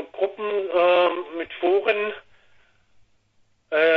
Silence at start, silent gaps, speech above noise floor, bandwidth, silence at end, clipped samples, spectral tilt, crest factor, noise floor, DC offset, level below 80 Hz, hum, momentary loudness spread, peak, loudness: 0 s; none; 42 dB; 5.6 kHz; 0 s; under 0.1%; -5.5 dB/octave; 16 dB; -63 dBFS; under 0.1%; -68 dBFS; none; 12 LU; -8 dBFS; -22 LUFS